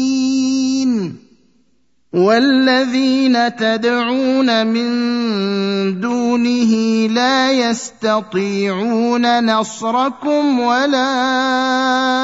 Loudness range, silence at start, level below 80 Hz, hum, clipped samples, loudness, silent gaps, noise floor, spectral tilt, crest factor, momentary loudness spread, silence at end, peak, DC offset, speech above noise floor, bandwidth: 2 LU; 0 s; -64 dBFS; none; under 0.1%; -15 LUFS; none; -64 dBFS; -4.5 dB/octave; 14 dB; 5 LU; 0 s; -2 dBFS; 0.1%; 49 dB; 8 kHz